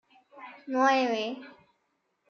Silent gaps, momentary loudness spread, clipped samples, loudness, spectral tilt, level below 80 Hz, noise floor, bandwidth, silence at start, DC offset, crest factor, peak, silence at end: none; 23 LU; under 0.1%; -27 LUFS; -3 dB/octave; -88 dBFS; -77 dBFS; 7 kHz; 0.35 s; under 0.1%; 18 dB; -12 dBFS; 0.8 s